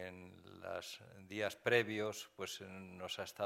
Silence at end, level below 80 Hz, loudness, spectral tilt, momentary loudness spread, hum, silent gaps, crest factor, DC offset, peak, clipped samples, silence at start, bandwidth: 0 s; -80 dBFS; -41 LUFS; -3.5 dB/octave; 18 LU; none; none; 24 dB; under 0.1%; -18 dBFS; under 0.1%; 0 s; 16 kHz